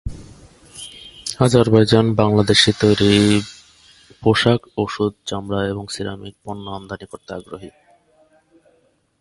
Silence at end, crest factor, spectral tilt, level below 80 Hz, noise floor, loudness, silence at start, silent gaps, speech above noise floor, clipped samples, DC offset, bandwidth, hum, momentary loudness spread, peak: 1.5 s; 20 dB; -5.5 dB/octave; -42 dBFS; -61 dBFS; -17 LUFS; 0.05 s; none; 43 dB; under 0.1%; under 0.1%; 11.5 kHz; none; 21 LU; 0 dBFS